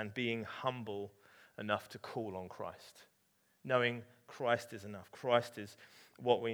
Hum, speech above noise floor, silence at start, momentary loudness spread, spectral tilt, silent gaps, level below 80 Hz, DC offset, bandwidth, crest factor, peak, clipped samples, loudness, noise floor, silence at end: none; 37 dB; 0 s; 20 LU; -5.5 dB/octave; none; -82 dBFS; under 0.1%; over 20 kHz; 24 dB; -14 dBFS; under 0.1%; -38 LUFS; -75 dBFS; 0 s